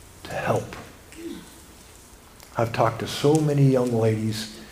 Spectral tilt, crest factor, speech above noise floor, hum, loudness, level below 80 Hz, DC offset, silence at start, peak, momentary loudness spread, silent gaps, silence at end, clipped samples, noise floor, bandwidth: -6.5 dB/octave; 20 dB; 27 dB; none; -23 LUFS; -52 dBFS; under 0.1%; 0.1 s; -6 dBFS; 20 LU; none; 0 s; under 0.1%; -48 dBFS; 16 kHz